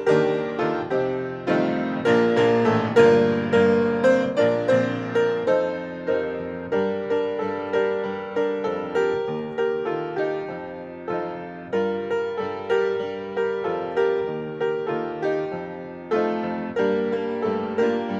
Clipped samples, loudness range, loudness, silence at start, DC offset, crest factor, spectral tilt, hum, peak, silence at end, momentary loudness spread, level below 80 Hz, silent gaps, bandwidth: under 0.1%; 7 LU; -23 LUFS; 0 s; under 0.1%; 18 dB; -7 dB/octave; none; -4 dBFS; 0 s; 10 LU; -62 dBFS; none; 8 kHz